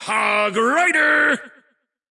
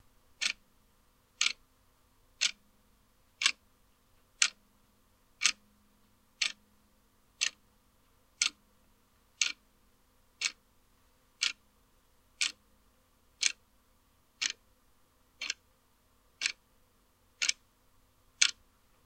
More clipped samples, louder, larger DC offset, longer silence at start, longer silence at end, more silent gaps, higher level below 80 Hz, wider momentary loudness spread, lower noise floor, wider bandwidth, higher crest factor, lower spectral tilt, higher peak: neither; first, -17 LUFS vs -33 LUFS; neither; second, 0 s vs 0.4 s; about the same, 0.6 s vs 0.55 s; neither; about the same, -74 dBFS vs -72 dBFS; second, 4 LU vs 15 LU; second, -65 dBFS vs -69 dBFS; second, 12 kHz vs 16.5 kHz; second, 14 dB vs 34 dB; first, -2.5 dB/octave vs 3.5 dB/octave; about the same, -4 dBFS vs -6 dBFS